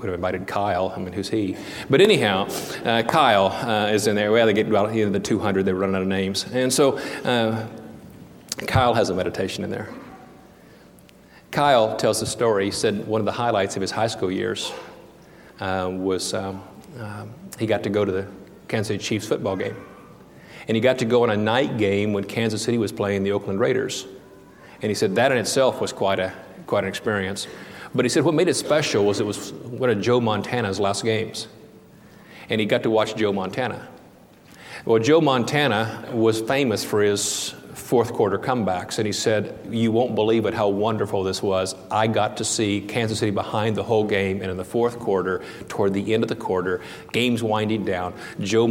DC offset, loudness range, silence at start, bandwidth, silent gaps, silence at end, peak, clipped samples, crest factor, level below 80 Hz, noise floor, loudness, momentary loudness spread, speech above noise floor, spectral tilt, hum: under 0.1%; 6 LU; 0 s; 17.5 kHz; none; 0 s; -4 dBFS; under 0.1%; 20 dB; -56 dBFS; -49 dBFS; -22 LUFS; 12 LU; 27 dB; -4.5 dB/octave; none